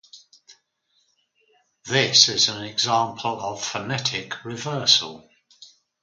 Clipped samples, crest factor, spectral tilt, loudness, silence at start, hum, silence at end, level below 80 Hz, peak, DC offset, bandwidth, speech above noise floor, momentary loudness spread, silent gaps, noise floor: under 0.1%; 24 dB; -1.5 dB/octave; -20 LUFS; 0.15 s; none; 0.35 s; -66 dBFS; 0 dBFS; under 0.1%; 11 kHz; 46 dB; 16 LU; none; -69 dBFS